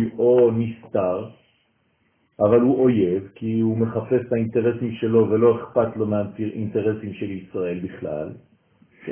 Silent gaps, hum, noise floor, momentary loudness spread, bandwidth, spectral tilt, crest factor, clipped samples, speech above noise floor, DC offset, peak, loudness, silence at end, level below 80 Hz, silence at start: none; none; -66 dBFS; 13 LU; 3.4 kHz; -12.5 dB/octave; 18 dB; under 0.1%; 45 dB; under 0.1%; -4 dBFS; -22 LUFS; 0 s; -54 dBFS; 0 s